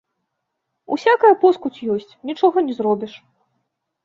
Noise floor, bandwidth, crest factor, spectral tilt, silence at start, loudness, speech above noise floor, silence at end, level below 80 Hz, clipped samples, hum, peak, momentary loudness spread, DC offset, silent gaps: -77 dBFS; 7.2 kHz; 18 dB; -6.5 dB/octave; 0.9 s; -18 LUFS; 59 dB; 0.9 s; -68 dBFS; under 0.1%; none; -2 dBFS; 13 LU; under 0.1%; none